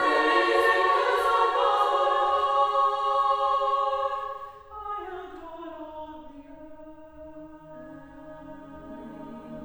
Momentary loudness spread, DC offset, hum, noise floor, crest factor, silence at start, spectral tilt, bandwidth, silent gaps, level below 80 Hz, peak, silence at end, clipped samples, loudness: 24 LU; under 0.1%; none; -45 dBFS; 18 dB; 0 s; -3.5 dB/octave; over 20 kHz; none; -58 dBFS; -10 dBFS; 0 s; under 0.1%; -24 LUFS